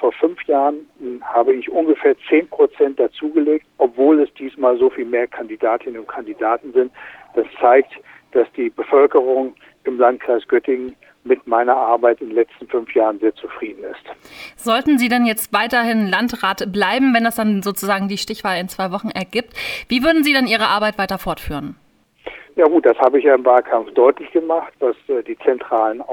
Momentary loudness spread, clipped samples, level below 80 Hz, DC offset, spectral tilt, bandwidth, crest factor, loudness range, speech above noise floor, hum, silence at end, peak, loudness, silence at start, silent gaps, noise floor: 14 LU; under 0.1%; -50 dBFS; under 0.1%; -4.5 dB/octave; 19.5 kHz; 16 dB; 3 LU; 20 dB; none; 0 s; 0 dBFS; -17 LUFS; 0 s; none; -37 dBFS